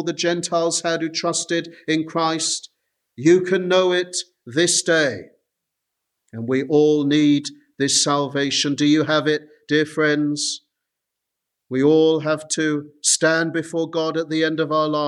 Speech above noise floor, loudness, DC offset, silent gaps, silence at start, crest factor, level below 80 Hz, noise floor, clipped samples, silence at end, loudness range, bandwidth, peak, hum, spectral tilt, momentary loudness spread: 62 dB; -19 LUFS; under 0.1%; none; 0 s; 16 dB; -70 dBFS; -82 dBFS; under 0.1%; 0 s; 3 LU; 12.5 kHz; -4 dBFS; none; -3.5 dB/octave; 8 LU